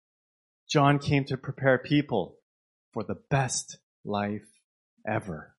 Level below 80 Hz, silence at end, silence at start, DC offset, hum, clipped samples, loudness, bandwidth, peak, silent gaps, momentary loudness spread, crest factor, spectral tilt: -60 dBFS; 0.15 s; 0.7 s; under 0.1%; none; under 0.1%; -28 LUFS; 11.5 kHz; -6 dBFS; 2.42-2.92 s, 3.83-4.04 s, 4.64-4.97 s; 17 LU; 22 dB; -5.5 dB/octave